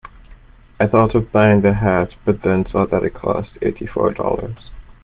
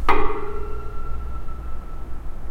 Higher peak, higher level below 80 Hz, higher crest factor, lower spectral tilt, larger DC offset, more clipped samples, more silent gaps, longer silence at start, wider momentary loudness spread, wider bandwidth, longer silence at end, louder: about the same, -2 dBFS vs -2 dBFS; second, -38 dBFS vs -26 dBFS; about the same, 16 dB vs 18 dB; about the same, -7.5 dB/octave vs -6.5 dB/octave; neither; neither; neither; first, 0.3 s vs 0 s; second, 10 LU vs 14 LU; about the same, 4.6 kHz vs 4.7 kHz; about the same, 0.1 s vs 0 s; first, -17 LUFS vs -31 LUFS